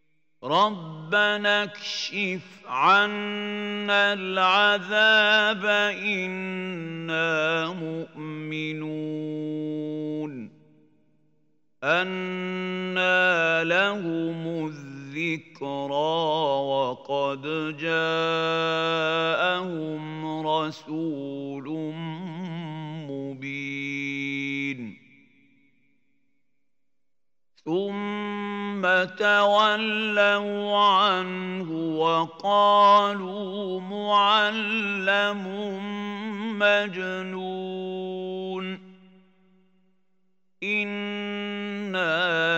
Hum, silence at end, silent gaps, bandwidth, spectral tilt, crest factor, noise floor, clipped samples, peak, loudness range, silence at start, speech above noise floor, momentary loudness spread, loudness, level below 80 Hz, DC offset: none; 0 s; none; 16 kHz; -5 dB/octave; 18 dB; -88 dBFS; under 0.1%; -6 dBFS; 11 LU; 0.4 s; 63 dB; 14 LU; -25 LUFS; -80 dBFS; under 0.1%